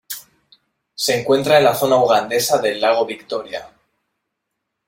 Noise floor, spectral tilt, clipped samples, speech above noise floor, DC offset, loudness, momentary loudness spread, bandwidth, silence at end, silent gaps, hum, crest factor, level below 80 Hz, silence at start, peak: -77 dBFS; -3.5 dB/octave; under 0.1%; 61 dB; under 0.1%; -17 LUFS; 18 LU; 16.5 kHz; 1.2 s; none; none; 18 dB; -62 dBFS; 0.1 s; -2 dBFS